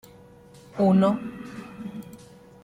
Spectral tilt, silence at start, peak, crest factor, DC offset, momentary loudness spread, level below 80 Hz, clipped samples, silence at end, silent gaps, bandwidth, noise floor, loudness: -8.5 dB/octave; 0.75 s; -10 dBFS; 18 dB; under 0.1%; 21 LU; -62 dBFS; under 0.1%; 0.5 s; none; 10.5 kHz; -50 dBFS; -22 LUFS